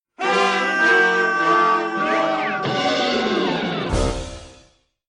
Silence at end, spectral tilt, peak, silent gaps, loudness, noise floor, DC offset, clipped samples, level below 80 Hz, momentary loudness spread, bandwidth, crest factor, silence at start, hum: 0.55 s; -4 dB/octave; -4 dBFS; none; -19 LUFS; -55 dBFS; under 0.1%; under 0.1%; -36 dBFS; 8 LU; 10.5 kHz; 16 dB; 0.2 s; none